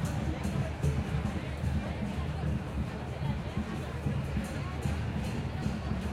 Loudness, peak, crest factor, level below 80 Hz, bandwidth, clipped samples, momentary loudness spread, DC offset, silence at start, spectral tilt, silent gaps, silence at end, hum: -34 LUFS; -18 dBFS; 14 dB; -40 dBFS; 14.5 kHz; under 0.1%; 4 LU; under 0.1%; 0 s; -7 dB/octave; none; 0 s; none